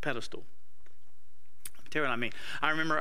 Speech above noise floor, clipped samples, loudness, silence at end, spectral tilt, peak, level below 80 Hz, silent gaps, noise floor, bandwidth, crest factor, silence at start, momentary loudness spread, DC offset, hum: 35 dB; under 0.1%; -33 LUFS; 0 s; -4 dB/octave; -10 dBFS; -66 dBFS; none; -69 dBFS; 16 kHz; 24 dB; 0 s; 18 LU; 3%; none